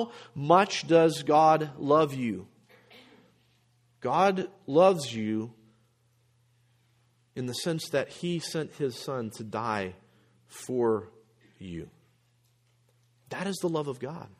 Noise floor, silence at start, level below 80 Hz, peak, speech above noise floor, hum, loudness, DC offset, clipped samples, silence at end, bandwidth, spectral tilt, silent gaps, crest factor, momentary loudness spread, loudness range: -68 dBFS; 0 s; -70 dBFS; -6 dBFS; 41 dB; none; -27 LUFS; under 0.1%; under 0.1%; 0.15 s; 15 kHz; -5.5 dB/octave; none; 24 dB; 18 LU; 10 LU